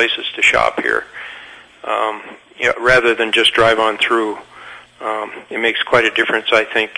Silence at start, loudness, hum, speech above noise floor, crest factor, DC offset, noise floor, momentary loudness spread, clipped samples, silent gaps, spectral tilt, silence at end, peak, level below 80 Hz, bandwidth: 0 s; -15 LUFS; 60 Hz at -55 dBFS; 22 dB; 16 dB; under 0.1%; -38 dBFS; 19 LU; under 0.1%; none; -3 dB/octave; 0.05 s; 0 dBFS; -46 dBFS; 11 kHz